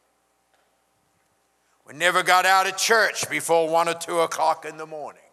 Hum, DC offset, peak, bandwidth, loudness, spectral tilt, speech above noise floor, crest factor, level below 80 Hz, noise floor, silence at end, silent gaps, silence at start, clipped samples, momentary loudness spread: 60 Hz at -65 dBFS; under 0.1%; -4 dBFS; 14.5 kHz; -21 LUFS; -1.5 dB/octave; 46 dB; 20 dB; -82 dBFS; -68 dBFS; 0.2 s; none; 1.9 s; under 0.1%; 17 LU